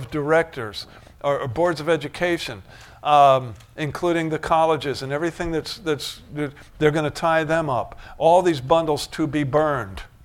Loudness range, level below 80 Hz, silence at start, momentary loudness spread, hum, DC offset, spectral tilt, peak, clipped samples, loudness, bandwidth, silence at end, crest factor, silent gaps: 3 LU; -46 dBFS; 0 s; 14 LU; none; under 0.1%; -5.5 dB/octave; -4 dBFS; under 0.1%; -22 LUFS; 16.5 kHz; 0.15 s; 18 dB; none